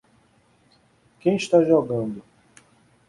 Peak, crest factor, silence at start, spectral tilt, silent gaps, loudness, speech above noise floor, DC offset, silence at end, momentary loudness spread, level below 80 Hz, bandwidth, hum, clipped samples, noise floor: -4 dBFS; 20 dB; 1.25 s; -6.5 dB/octave; none; -21 LUFS; 40 dB; under 0.1%; 0.9 s; 14 LU; -64 dBFS; 11.5 kHz; none; under 0.1%; -60 dBFS